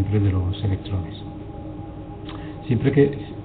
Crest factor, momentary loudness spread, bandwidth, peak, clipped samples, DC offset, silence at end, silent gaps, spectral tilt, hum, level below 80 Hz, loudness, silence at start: 20 dB; 16 LU; 4.4 kHz; -4 dBFS; under 0.1%; under 0.1%; 0 s; none; -12.5 dB/octave; none; -42 dBFS; -23 LUFS; 0 s